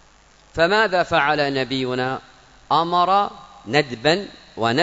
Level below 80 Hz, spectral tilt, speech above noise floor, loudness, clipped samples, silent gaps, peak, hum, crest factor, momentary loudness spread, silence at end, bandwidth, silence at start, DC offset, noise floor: -52 dBFS; -5 dB/octave; 33 dB; -20 LUFS; under 0.1%; none; -2 dBFS; none; 18 dB; 10 LU; 0 s; 8 kHz; 0.55 s; under 0.1%; -52 dBFS